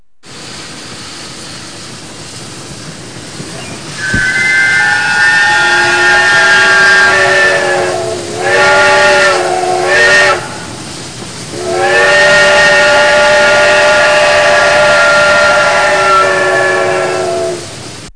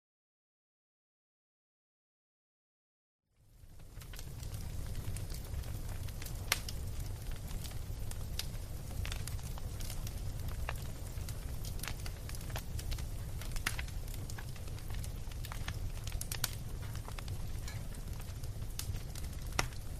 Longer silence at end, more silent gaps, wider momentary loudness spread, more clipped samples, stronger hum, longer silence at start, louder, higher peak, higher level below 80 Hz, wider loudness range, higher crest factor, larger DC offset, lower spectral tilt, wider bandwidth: about the same, 0.05 s vs 0 s; neither; first, 20 LU vs 7 LU; neither; neither; second, 0.25 s vs 3.45 s; first, -7 LUFS vs -42 LUFS; first, 0 dBFS vs -8 dBFS; about the same, -40 dBFS vs -44 dBFS; first, 11 LU vs 5 LU; second, 10 dB vs 34 dB; first, 1% vs under 0.1%; second, -2 dB/octave vs -3.5 dB/octave; second, 10.5 kHz vs 15.5 kHz